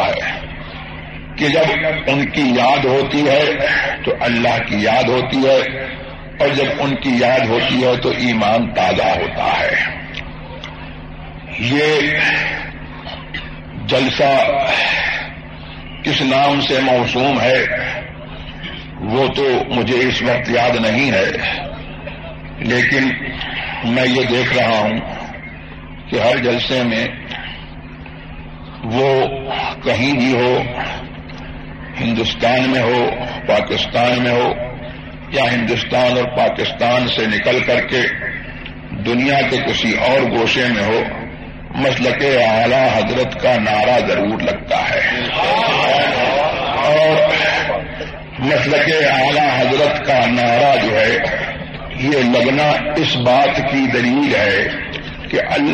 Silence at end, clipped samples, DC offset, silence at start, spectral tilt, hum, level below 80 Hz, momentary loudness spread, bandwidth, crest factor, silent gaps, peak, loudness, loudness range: 0 s; under 0.1%; under 0.1%; 0 s; -5 dB/octave; none; -38 dBFS; 17 LU; 9.2 kHz; 16 dB; none; -2 dBFS; -15 LUFS; 4 LU